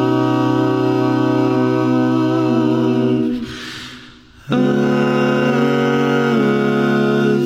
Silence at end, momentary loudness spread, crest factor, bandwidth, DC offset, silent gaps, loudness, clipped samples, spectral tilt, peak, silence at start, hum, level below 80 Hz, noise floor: 0 s; 6 LU; 10 dB; 14.5 kHz; under 0.1%; none; -16 LUFS; under 0.1%; -7.5 dB/octave; -4 dBFS; 0 s; none; -52 dBFS; -41 dBFS